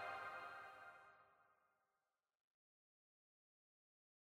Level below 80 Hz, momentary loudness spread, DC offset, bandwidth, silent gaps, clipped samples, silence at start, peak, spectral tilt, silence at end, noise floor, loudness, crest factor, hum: under -90 dBFS; 15 LU; under 0.1%; 15.5 kHz; none; under 0.1%; 0 s; -40 dBFS; -3 dB/octave; 2.8 s; under -90 dBFS; -54 LUFS; 20 dB; none